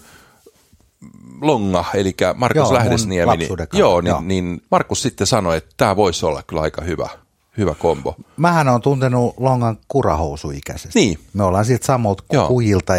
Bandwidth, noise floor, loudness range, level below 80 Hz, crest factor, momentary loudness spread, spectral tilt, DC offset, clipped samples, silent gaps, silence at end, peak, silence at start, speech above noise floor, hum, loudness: 16 kHz; -55 dBFS; 2 LU; -38 dBFS; 18 dB; 8 LU; -5.5 dB/octave; under 0.1%; under 0.1%; none; 0 s; 0 dBFS; 1 s; 38 dB; none; -17 LUFS